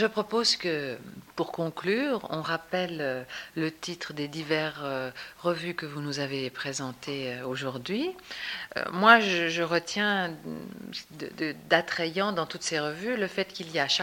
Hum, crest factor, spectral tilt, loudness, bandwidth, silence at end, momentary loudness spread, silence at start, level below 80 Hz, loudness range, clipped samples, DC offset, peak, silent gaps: none; 26 dB; -3.5 dB/octave; -29 LUFS; 17 kHz; 0 s; 12 LU; 0 s; -68 dBFS; 7 LU; under 0.1%; under 0.1%; -2 dBFS; none